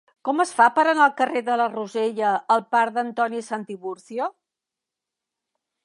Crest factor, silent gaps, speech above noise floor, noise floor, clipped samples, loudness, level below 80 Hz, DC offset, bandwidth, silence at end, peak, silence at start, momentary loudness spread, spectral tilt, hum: 18 dB; none; 65 dB; -87 dBFS; under 0.1%; -22 LUFS; -82 dBFS; under 0.1%; 11.5 kHz; 1.55 s; -4 dBFS; 0.25 s; 13 LU; -4 dB/octave; none